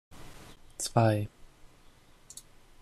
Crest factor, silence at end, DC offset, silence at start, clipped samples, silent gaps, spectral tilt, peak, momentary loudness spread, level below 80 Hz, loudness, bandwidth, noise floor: 22 dB; 1.35 s; under 0.1%; 0.1 s; under 0.1%; none; -5.5 dB/octave; -12 dBFS; 25 LU; -56 dBFS; -29 LUFS; 14.5 kHz; -57 dBFS